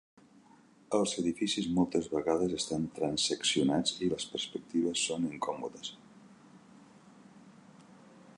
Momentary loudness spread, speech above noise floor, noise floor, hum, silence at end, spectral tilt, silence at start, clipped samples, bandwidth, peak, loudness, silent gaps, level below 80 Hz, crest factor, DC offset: 8 LU; 29 dB; -61 dBFS; none; 0.05 s; -4 dB/octave; 0.9 s; under 0.1%; 11.5 kHz; -16 dBFS; -32 LUFS; none; -64 dBFS; 20 dB; under 0.1%